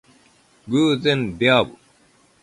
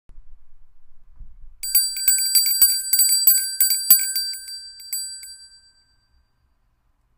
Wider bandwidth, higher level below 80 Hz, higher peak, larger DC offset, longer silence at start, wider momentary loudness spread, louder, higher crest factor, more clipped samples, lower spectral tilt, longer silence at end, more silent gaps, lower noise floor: second, 11.5 kHz vs 16.5 kHz; about the same, -54 dBFS vs -50 dBFS; second, -4 dBFS vs 0 dBFS; neither; first, 0.65 s vs 0.15 s; second, 6 LU vs 19 LU; second, -19 LUFS vs -16 LUFS; about the same, 18 dB vs 22 dB; neither; first, -5.5 dB/octave vs 4 dB/octave; second, 0.75 s vs 1.7 s; neither; second, -57 dBFS vs -64 dBFS